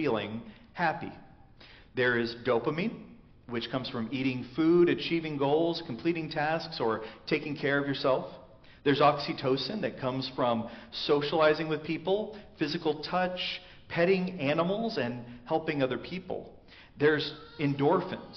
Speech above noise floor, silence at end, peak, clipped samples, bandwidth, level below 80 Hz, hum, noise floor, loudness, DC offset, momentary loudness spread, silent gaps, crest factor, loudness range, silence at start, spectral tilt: 25 dB; 0 s; -12 dBFS; under 0.1%; 6.4 kHz; -62 dBFS; none; -54 dBFS; -30 LUFS; under 0.1%; 12 LU; none; 18 dB; 3 LU; 0 s; -4 dB/octave